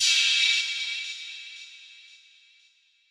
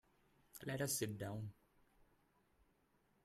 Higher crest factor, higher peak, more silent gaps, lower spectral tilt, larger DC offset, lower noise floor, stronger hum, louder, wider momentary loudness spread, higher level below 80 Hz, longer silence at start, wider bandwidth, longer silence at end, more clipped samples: about the same, 18 dB vs 22 dB; first, -10 dBFS vs -28 dBFS; neither; second, 8 dB/octave vs -4 dB/octave; neither; second, -63 dBFS vs -78 dBFS; neither; first, -23 LUFS vs -44 LUFS; first, 24 LU vs 13 LU; second, under -90 dBFS vs -76 dBFS; second, 0 s vs 0.55 s; about the same, 14.5 kHz vs 15.5 kHz; second, 1.1 s vs 1.7 s; neither